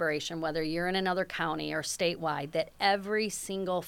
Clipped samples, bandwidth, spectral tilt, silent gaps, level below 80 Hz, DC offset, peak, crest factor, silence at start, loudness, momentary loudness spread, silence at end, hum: under 0.1%; 19 kHz; -3.5 dB/octave; none; -58 dBFS; under 0.1%; -12 dBFS; 20 dB; 0 s; -31 LUFS; 5 LU; 0 s; none